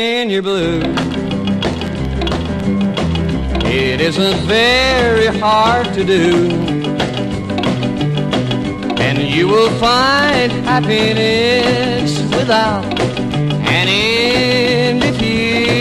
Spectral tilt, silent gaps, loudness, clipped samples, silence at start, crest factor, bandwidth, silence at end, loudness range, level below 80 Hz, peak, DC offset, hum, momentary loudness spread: -5.5 dB/octave; none; -14 LUFS; under 0.1%; 0 s; 14 dB; 13 kHz; 0 s; 4 LU; -30 dBFS; 0 dBFS; under 0.1%; none; 7 LU